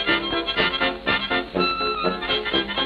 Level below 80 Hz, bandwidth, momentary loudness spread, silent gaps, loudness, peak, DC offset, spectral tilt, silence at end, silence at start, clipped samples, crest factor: -44 dBFS; 10.5 kHz; 2 LU; none; -22 LUFS; -6 dBFS; under 0.1%; -5.5 dB/octave; 0 s; 0 s; under 0.1%; 18 dB